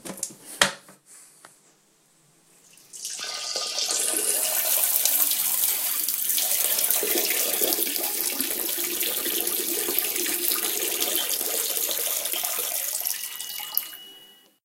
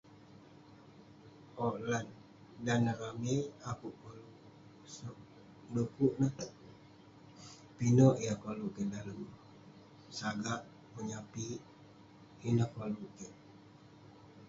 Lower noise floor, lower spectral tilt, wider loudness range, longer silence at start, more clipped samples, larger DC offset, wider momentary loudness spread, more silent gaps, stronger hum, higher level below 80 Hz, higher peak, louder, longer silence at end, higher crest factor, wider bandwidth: about the same, -61 dBFS vs -58 dBFS; second, 1 dB/octave vs -7 dB/octave; about the same, 9 LU vs 8 LU; about the same, 0.05 s vs 0.1 s; neither; neither; second, 10 LU vs 25 LU; neither; neither; about the same, -72 dBFS vs -68 dBFS; first, 0 dBFS vs -14 dBFS; first, -23 LUFS vs -36 LUFS; first, 0.4 s vs 0 s; about the same, 26 dB vs 24 dB; first, 17 kHz vs 7.6 kHz